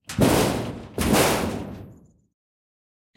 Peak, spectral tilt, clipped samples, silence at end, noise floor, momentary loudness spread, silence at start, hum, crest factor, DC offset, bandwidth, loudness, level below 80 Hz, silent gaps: -6 dBFS; -4.5 dB/octave; under 0.1%; 1.25 s; -49 dBFS; 16 LU; 0.1 s; none; 18 dB; under 0.1%; 16.5 kHz; -22 LUFS; -42 dBFS; none